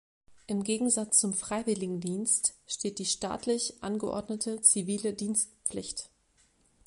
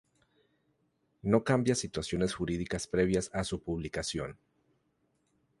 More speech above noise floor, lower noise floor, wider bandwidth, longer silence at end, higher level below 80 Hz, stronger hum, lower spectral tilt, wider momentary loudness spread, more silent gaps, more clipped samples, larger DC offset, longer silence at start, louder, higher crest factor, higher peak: second, 37 dB vs 44 dB; second, -68 dBFS vs -75 dBFS; about the same, 11.5 kHz vs 11.5 kHz; second, 0.8 s vs 1.25 s; second, -64 dBFS vs -52 dBFS; neither; second, -3 dB/octave vs -5 dB/octave; first, 11 LU vs 8 LU; neither; neither; neither; second, 0.3 s vs 1.25 s; first, -29 LUFS vs -32 LUFS; about the same, 22 dB vs 22 dB; first, -8 dBFS vs -12 dBFS